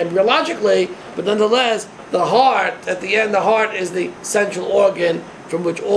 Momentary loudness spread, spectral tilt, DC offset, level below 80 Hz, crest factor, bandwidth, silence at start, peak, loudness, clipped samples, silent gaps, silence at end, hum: 9 LU; -3.5 dB/octave; under 0.1%; -62 dBFS; 16 dB; 11 kHz; 0 s; 0 dBFS; -17 LUFS; under 0.1%; none; 0 s; none